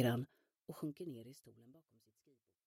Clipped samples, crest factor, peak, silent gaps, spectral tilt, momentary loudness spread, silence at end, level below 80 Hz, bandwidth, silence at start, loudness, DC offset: under 0.1%; 22 dB; -22 dBFS; none; -6.5 dB/octave; 23 LU; 0.95 s; -82 dBFS; 16 kHz; 0 s; -46 LUFS; under 0.1%